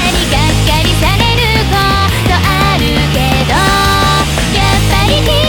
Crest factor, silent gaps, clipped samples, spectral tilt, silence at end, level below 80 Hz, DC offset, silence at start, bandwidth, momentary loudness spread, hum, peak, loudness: 10 dB; none; under 0.1%; -4.5 dB/octave; 0 s; -18 dBFS; under 0.1%; 0 s; 20 kHz; 2 LU; none; 0 dBFS; -10 LUFS